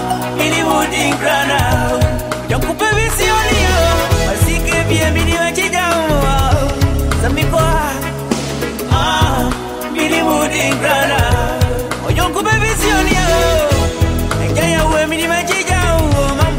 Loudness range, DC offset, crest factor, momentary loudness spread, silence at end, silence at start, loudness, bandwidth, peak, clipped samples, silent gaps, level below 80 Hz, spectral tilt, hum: 2 LU; under 0.1%; 14 dB; 5 LU; 0 s; 0 s; -14 LUFS; 16.5 kHz; 0 dBFS; under 0.1%; none; -22 dBFS; -4.5 dB/octave; none